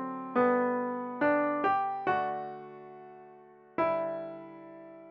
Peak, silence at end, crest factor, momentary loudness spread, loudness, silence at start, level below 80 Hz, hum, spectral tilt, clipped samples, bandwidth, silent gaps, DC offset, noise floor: -14 dBFS; 0 s; 18 dB; 21 LU; -30 LUFS; 0 s; -76 dBFS; none; -8 dB/octave; under 0.1%; 5.6 kHz; none; under 0.1%; -55 dBFS